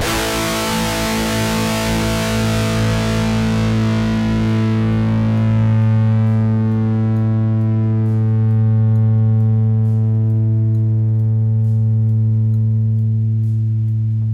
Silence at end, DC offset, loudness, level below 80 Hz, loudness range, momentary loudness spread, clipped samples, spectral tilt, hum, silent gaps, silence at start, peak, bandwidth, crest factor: 0 s; under 0.1%; -16 LUFS; -34 dBFS; 2 LU; 3 LU; under 0.1%; -6.5 dB/octave; none; none; 0 s; -8 dBFS; 15.5 kHz; 8 dB